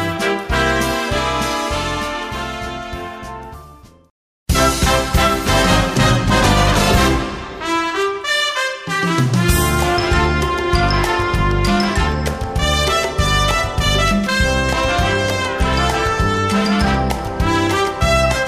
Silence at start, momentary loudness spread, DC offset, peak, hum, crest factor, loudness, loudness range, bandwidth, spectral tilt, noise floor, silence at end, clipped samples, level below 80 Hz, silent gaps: 0 s; 9 LU; under 0.1%; -2 dBFS; none; 16 dB; -16 LUFS; 6 LU; 15.5 kHz; -4.5 dB/octave; -41 dBFS; 0 s; under 0.1%; -24 dBFS; 4.10-4.46 s